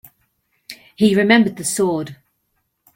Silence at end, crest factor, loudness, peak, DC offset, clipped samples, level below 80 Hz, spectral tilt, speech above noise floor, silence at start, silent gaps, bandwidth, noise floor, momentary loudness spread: 0.8 s; 18 dB; -16 LUFS; -2 dBFS; under 0.1%; under 0.1%; -60 dBFS; -4.5 dB/octave; 54 dB; 0.7 s; none; 16.5 kHz; -70 dBFS; 24 LU